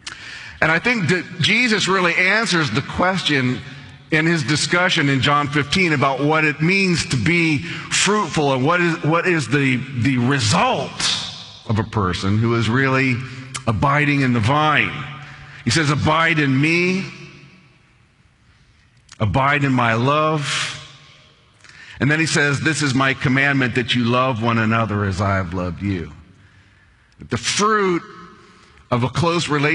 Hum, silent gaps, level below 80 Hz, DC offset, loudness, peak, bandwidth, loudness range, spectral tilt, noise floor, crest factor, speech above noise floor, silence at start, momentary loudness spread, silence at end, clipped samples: none; none; -48 dBFS; under 0.1%; -18 LUFS; 0 dBFS; 11 kHz; 5 LU; -4.5 dB/octave; -55 dBFS; 18 dB; 37 dB; 0.05 s; 9 LU; 0 s; under 0.1%